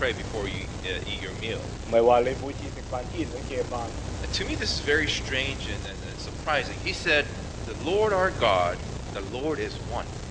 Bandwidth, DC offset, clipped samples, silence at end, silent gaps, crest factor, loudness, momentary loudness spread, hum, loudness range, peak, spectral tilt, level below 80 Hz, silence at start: 9.8 kHz; under 0.1%; under 0.1%; 0 s; none; 20 dB; -28 LUFS; 12 LU; none; 2 LU; -8 dBFS; -4.5 dB/octave; -40 dBFS; 0 s